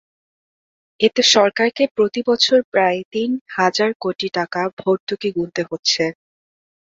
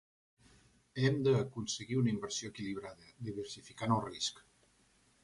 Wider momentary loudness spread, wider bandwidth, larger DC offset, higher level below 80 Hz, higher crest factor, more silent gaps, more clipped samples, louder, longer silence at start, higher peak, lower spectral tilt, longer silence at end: second, 9 LU vs 14 LU; second, 7.8 kHz vs 11.5 kHz; neither; about the same, -64 dBFS vs -68 dBFS; about the same, 18 dB vs 20 dB; first, 1.91-1.95 s, 2.64-2.72 s, 3.05-3.11 s, 3.41-3.46 s, 3.95-4.00 s, 4.73-4.77 s, 5.00-5.07 s, 5.79-5.83 s vs none; neither; first, -18 LUFS vs -36 LUFS; about the same, 1 s vs 0.95 s; first, -2 dBFS vs -18 dBFS; second, -3 dB/octave vs -5 dB/octave; second, 0.7 s vs 0.85 s